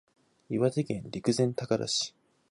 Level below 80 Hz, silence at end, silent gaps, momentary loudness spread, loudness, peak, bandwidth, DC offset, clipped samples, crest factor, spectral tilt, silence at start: -66 dBFS; 0.4 s; none; 7 LU; -30 LUFS; -14 dBFS; 11.5 kHz; under 0.1%; under 0.1%; 18 dB; -5 dB/octave; 0.5 s